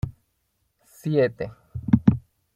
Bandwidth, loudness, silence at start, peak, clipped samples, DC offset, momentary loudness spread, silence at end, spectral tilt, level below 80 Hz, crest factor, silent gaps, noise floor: 14.5 kHz; -23 LUFS; 0.05 s; -2 dBFS; under 0.1%; under 0.1%; 15 LU; 0.35 s; -9 dB/octave; -46 dBFS; 24 dB; none; -72 dBFS